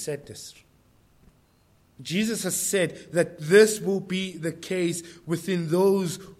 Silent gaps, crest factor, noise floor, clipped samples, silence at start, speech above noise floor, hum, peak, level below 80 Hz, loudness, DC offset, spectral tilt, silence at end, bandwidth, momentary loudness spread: none; 22 dB; -61 dBFS; under 0.1%; 0 s; 37 dB; none; -4 dBFS; -66 dBFS; -25 LUFS; under 0.1%; -4.5 dB/octave; 0.05 s; 16 kHz; 16 LU